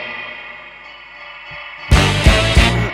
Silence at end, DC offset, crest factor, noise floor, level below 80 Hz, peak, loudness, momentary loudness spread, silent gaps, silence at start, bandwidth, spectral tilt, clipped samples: 0 s; under 0.1%; 16 dB; -37 dBFS; -20 dBFS; 0 dBFS; -13 LUFS; 22 LU; none; 0 s; 13.5 kHz; -4.5 dB/octave; under 0.1%